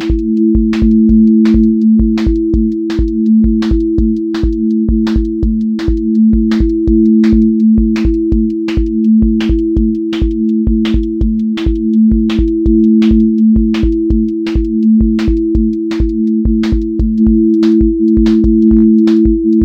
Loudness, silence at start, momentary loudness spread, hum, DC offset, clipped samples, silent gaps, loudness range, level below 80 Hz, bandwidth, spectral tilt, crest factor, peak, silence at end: -11 LUFS; 0 s; 6 LU; none; under 0.1%; under 0.1%; none; 3 LU; -18 dBFS; 6.4 kHz; -9 dB/octave; 10 dB; 0 dBFS; 0 s